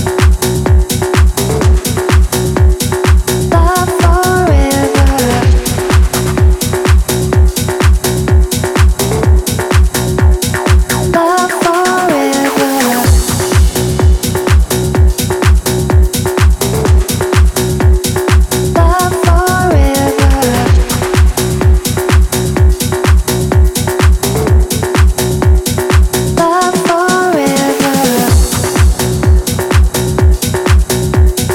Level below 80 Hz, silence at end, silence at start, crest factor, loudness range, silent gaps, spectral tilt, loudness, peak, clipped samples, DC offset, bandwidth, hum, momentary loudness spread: -12 dBFS; 0 s; 0 s; 10 dB; 1 LU; none; -5 dB/octave; -11 LUFS; 0 dBFS; under 0.1%; under 0.1%; 17.5 kHz; none; 2 LU